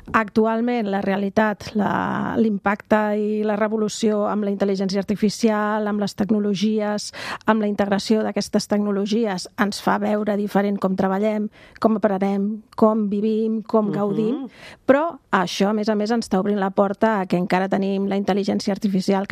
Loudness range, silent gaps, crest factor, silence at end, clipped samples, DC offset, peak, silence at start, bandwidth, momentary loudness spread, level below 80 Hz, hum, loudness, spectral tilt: 1 LU; none; 18 dB; 0.05 s; under 0.1%; under 0.1%; -2 dBFS; 0.05 s; 14.5 kHz; 4 LU; -56 dBFS; none; -21 LUFS; -6 dB/octave